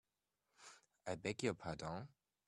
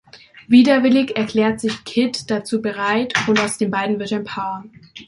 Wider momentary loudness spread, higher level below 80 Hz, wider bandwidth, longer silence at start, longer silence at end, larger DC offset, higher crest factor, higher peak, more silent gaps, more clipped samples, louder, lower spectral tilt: first, 19 LU vs 11 LU; second, -74 dBFS vs -58 dBFS; first, 13 kHz vs 11.5 kHz; first, 0.6 s vs 0.15 s; first, 0.4 s vs 0.05 s; neither; first, 24 dB vs 16 dB; second, -24 dBFS vs -2 dBFS; neither; neither; second, -46 LUFS vs -18 LUFS; about the same, -5 dB/octave vs -4.5 dB/octave